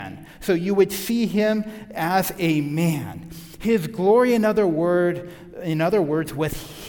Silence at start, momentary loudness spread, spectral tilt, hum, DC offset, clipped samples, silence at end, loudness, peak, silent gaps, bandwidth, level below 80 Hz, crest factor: 0 s; 14 LU; -6 dB/octave; none; under 0.1%; under 0.1%; 0 s; -21 LUFS; -6 dBFS; none; 18 kHz; -50 dBFS; 16 dB